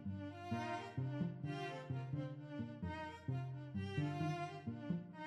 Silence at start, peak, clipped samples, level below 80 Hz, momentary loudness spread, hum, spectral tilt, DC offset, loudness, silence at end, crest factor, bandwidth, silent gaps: 0 s; -28 dBFS; under 0.1%; -70 dBFS; 6 LU; none; -7.5 dB/octave; under 0.1%; -45 LUFS; 0 s; 16 dB; 10.5 kHz; none